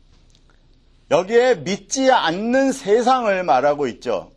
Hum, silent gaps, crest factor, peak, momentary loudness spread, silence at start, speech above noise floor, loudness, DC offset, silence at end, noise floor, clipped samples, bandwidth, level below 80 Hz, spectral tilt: none; none; 18 dB; -2 dBFS; 7 LU; 1.1 s; 35 dB; -18 LUFS; under 0.1%; 0.1 s; -53 dBFS; under 0.1%; 12 kHz; -54 dBFS; -4 dB/octave